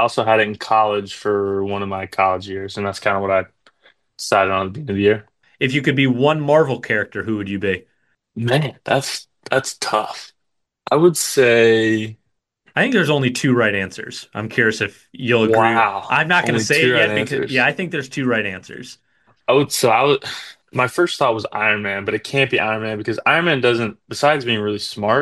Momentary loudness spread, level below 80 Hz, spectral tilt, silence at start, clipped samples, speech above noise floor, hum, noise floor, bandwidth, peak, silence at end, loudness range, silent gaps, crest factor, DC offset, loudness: 12 LU; -60 dBFS; -4.5 dB/octave; 0 s; under 0.1%; 57 dB; none; -75 dBFS; 12.5 kHz; -2 dBFS; 0 s; 5 LU; none; 16 dB; under 0.1%; -18 LUFS